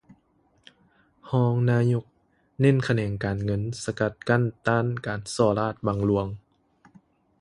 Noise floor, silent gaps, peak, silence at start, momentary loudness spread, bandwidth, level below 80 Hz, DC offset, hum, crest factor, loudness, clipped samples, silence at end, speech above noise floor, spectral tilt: -65 dBFS; none; -6 dBFS; 1.25 s; 8 LU; 11.5 kHz; -52 dBFS; under 0.1%; none; 20 dB; -25 LUFS; under 0.1%; 1 s; 41 dB; -7 dB/octave